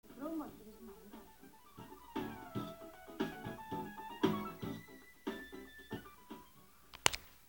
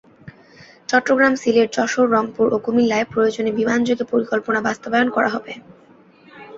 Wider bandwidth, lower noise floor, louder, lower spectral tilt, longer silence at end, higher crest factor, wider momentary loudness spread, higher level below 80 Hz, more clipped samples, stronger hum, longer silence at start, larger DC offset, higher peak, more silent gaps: first, 18 kHz vs 7.8 kHz; first, -64 dBFS vs -49 dBFS; second, -42 LUFS vs -18 LUFS; about the same, -3.5 dB/octave vs -4.5 dB/octave; about the same, 0 s vs 0 s; first, 38 dB vs 18 dB; first, 21 LU vs 5 LU; second, -66 dBFS vs -60 dBFS; neither; neither; second, 0.05 s vs 0.25 s; neither; second, -6 dBFS vs -2 dBFS; neither